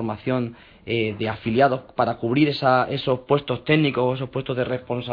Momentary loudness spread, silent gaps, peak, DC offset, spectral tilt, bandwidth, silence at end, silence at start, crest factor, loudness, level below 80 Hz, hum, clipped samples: 8 LU; none; -4 dBFS; under 0.1%; -9 dB/octave; 5.2 kHz; 0 s; 0 s; 18 dB; -22 LUFS; -54 dBFS; none; under 0.1%